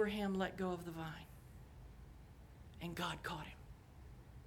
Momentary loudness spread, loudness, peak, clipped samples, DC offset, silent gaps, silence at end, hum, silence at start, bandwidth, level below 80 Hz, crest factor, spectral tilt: 20 LU; -44 LUFS; -26 dBFS; under 0.1%; under 0.1%; none; 0 s; none; 0 s; 18.5 kHz; -60 dBFS; 18 dB; -5.5 dB/octave